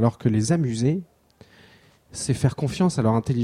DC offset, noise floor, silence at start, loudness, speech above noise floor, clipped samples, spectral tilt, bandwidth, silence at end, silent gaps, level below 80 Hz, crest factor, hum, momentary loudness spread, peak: under 0.1%; -54 dBFS; 0 s; -23 LUFS; 32 dB; under 0.1%; -6.5 dB/octave; 12.5 kHz; 0 s; none; -50 dBFS; 18 dB; none; 8 LU; -6 dBFS